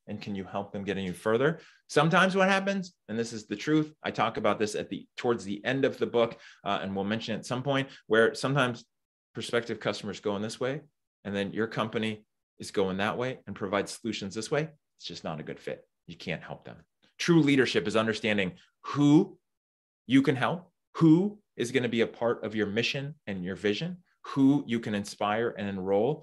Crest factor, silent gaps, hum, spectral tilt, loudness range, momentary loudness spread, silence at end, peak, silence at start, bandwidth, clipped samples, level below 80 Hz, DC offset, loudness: 22 dB; 9.05-9.34 s, 11.07-11.23 s, 12.43-12.57 s, 19.57-20.05 s, 20.87-20.93 s; none; -5.5 dB/octave; 6 LU; 15 LU; 0 s; -6 dBFS; 0.1 s; 12.5 kHz; under 0.1%; -70 dBFS; under 0.1%; -29 LUFS